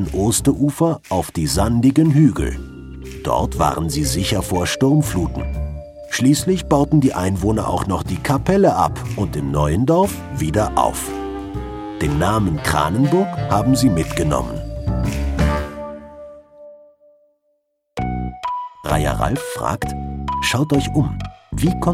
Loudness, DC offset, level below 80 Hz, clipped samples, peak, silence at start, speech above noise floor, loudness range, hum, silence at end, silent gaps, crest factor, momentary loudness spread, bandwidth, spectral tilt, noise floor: -19 LUFS; under 0.1%; -32 dBFS; under 0.1%; -2 dBFS; 0 s; 50 dB; 8 LU; none; 0 s; none; 16 dB; 12 LU; 16 kHz; -6 dB/octave; -68 dBFS